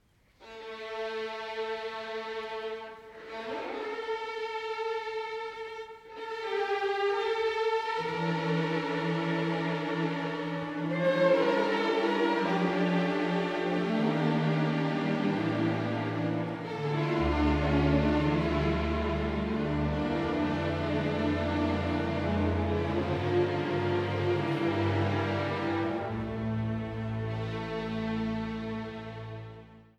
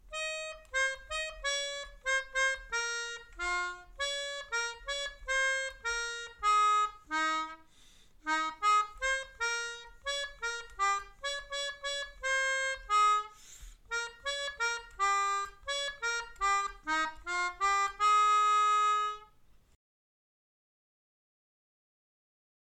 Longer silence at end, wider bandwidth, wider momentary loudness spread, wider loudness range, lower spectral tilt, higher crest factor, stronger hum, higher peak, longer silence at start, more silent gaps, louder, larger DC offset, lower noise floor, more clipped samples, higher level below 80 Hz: second, 0.15 s vs 3.5 s; second, 10.5 kHz vs 13.5 kHz; about the same, 10 LU vs 11 LU; first, 8 LU vs 5 LU; first, -7.5 dB/octave vs 0 dB/octave; about the same, 16 dB vs 14 dB; neither; first, -14 dBFS vs -20 dBFS; first, 0.4 s vs 0.1 s; neither; about the same, -30 LUFS vs -32 LUFS; neither; second, -56 dBFS vs -61 dBFS; neither; first, -46 dBFS vs -58 dBFS